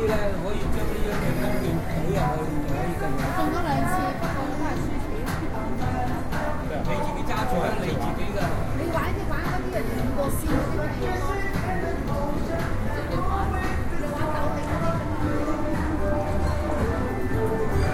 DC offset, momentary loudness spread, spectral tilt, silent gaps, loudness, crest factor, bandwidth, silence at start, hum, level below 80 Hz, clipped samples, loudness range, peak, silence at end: under 0.1%; 3 LU; -6.5 dB/octave; none; -27 LUFS; 14 dB; 15.5 kHz; 0 s; none; -30 dBFS; under 0.1%; 1 LU; -10 dBFS; 0 s